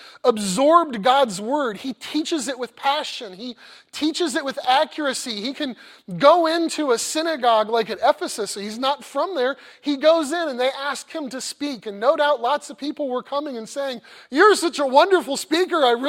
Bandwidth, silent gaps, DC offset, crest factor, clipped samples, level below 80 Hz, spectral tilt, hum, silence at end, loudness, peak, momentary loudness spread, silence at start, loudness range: 16.5 kHz; none; under 0.1%; 20 dB; under 0.1%; -70 dBFS; -3 dB/octave; none; 0 s; -21 LUFS; 0 dBFS; 13 LU; 0 s; 4 LU